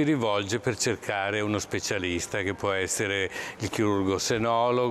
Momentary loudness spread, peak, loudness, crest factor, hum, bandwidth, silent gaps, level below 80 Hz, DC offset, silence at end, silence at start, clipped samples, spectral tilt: 5 LU; -14 dBFS; -27 LUFS; 14 dB; none; 14 kHz; none; -56 dBFS; under 0.1%; 0 s; 0 s; under 0.1%; -4 dB/octave